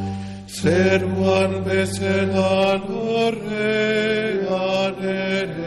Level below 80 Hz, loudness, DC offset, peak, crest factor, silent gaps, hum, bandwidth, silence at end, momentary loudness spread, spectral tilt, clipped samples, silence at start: -52 dBFS; -20 LUFS; under 0.1%; -6 dBFS; 16 dB; none; none; 12.5 kHz; 0 s; 5 LU; -5.5 dB/octave; under 0.1%; 0 s